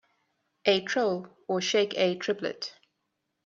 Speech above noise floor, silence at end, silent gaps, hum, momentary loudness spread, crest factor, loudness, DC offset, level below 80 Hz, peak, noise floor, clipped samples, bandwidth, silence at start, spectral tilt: 53 dB; 0.75 s; none; none; 10 LU; 22 dB; -28 LUFS; under 0.1%; -76 dBFS; -8 dBFS; -80 dBFS; under 0.1%; 7.6 kHz; 0.65 s; -3.5 dB/octave